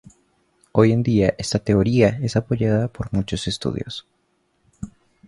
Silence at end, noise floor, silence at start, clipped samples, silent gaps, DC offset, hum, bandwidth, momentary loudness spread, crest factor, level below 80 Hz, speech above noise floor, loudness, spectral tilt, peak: 0.4 s; -67 dBFS; 0.75 s; under 0.1%; none; under 0.1%; none; 11.5 kHz; 18 LU; 20 dB; -42 dBFS; 48 dB; -20 LUFS; -6.5 dB/octave; -2 dBFS